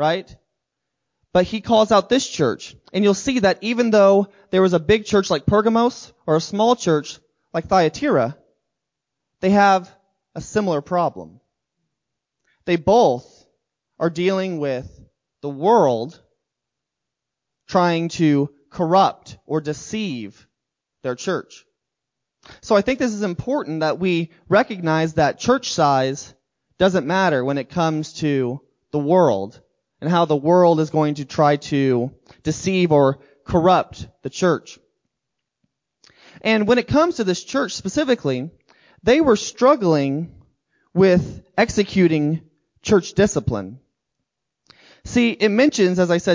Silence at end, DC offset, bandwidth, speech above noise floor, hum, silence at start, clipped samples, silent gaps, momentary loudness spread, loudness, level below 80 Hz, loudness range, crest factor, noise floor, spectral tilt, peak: 0 s; under 0.1%; 7.6 kHz; 64 dB; none; 0 s; under 0.1%; none; 12 LU; -19 LUFS; -48 dBFS; 5 LU; 18 dB; -83 dBFS; -5.5 dB/octave; -2 dBFS